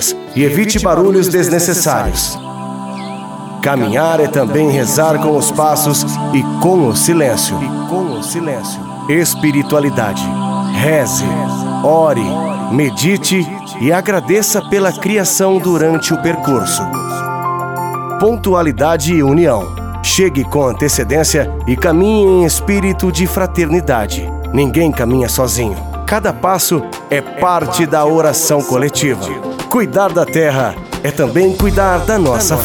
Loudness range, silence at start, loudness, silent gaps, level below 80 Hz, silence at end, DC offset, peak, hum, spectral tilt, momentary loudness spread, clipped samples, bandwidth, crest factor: 2 LU; 0 s; -13 LUFS; none; -28 dBFS; 0 s; under 0.1%; 0 dBFS; none; -4.5 dB/octave; 8 LU; under 0.1%; over 20 kHz; 12 dB